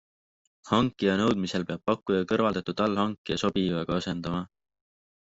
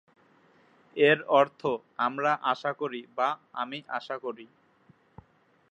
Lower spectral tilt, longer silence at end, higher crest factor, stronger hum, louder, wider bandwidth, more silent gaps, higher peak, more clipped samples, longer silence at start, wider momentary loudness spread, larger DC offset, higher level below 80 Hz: about the same, -6 dB/octave vs -5.5 dB/octave; second, 0.8 s vs 1.25 s; about the same, 20 dB vs 22 dB; neither; about the same, -28 LUFS vs -28 LUFS; about the same, 8 kHz vs 7.8 kHz; first, 3.18-3.25 s vs none; about the same, -8 dBFS vs -8 dBFS; neither; second, 0.65 s vs 0.95 s; second, 6 LU vs 13 LU; neither; first, -58 dBFS vs -74 dBFS